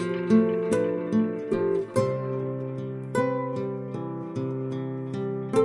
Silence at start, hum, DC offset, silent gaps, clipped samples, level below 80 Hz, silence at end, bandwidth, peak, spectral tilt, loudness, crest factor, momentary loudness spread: 0 s; none; under 0.1%; none; under 0.1%; -66 dBFS; 0 s; 11.5 kHz; -10 dBFS; -8 dB/octave; -27 LUFS; 18 dB; 10 LU